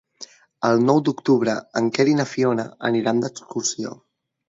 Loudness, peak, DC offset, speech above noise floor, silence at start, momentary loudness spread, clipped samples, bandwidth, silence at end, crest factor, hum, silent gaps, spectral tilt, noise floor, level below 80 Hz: -21 LUFS; -4 dBFS; under 0.1%; 24 dB; 0.2 s; 13 LU; under 0.1%; 8 kHz; 0.55 s; 18 dB; none; none; -5 dB/octave; -45 dBFS; -66 dBFS